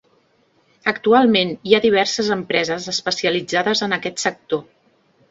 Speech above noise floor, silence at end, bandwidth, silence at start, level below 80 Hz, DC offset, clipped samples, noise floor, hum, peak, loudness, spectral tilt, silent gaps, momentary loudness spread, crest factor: 42 dB; 0.65 s; 8 kHz; 0.85 s; -60 dBFS; under 0.1%; under 0.1%; -60 dBFS; none; 0 dBFS; -18 LUFS; -3.5 dB/octave; none; 9 LU; 20 dB